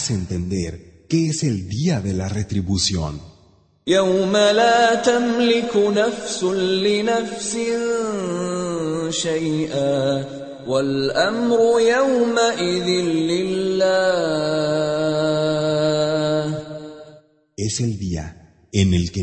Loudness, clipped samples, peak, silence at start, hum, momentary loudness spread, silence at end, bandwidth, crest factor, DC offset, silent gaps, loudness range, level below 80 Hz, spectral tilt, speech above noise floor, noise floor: -20 LUFS; under 0.1%; -2 dBFS; 0 s; none; 10 LU; 0 s; 8.8 kHz; 16 dB; under 0.1%; none; 5 LU; -46 dBFS; -5 dB/octave; 36 dB; -55 dBFS